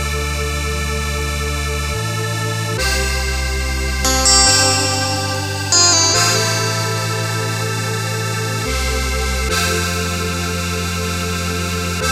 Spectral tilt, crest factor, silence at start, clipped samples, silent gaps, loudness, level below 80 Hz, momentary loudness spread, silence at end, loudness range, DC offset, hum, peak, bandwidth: -2.5 dB/octave; 18 dB; 0 s; under 0.1%; none; -16 LUFS; -26 dBFS; 10 LU; 0 s; 7 LU; under 0.1%; none; 0 dBFS; 16 kHz